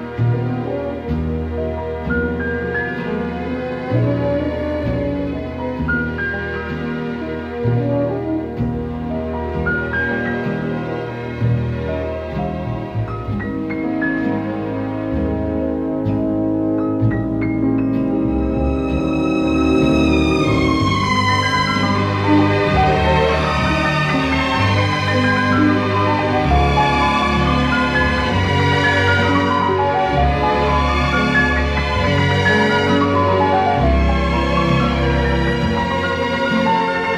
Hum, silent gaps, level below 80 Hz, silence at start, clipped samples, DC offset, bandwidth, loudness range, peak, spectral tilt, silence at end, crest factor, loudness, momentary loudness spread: none; none; -28 dBFS; 0 s; under 0.1%; under 0.1%; 11.5 kHz; 6 LU; -4 dBFS; -6.5 dB/octave; 0 s; 14 dB; -18 LUFS; 9 LU